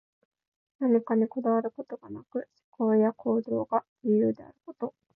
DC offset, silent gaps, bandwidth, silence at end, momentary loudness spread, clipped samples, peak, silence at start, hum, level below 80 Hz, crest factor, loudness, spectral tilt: under 0.1%; 2.64-2.72 s, 3.89-3.96 s; 2.5 kHz; 0.25 s; 15 LU; under 0.1%; -14 dBFS; 0.8 s; none; -76 dBFS; 16 dB; -28 LUFS; -12 dB/octave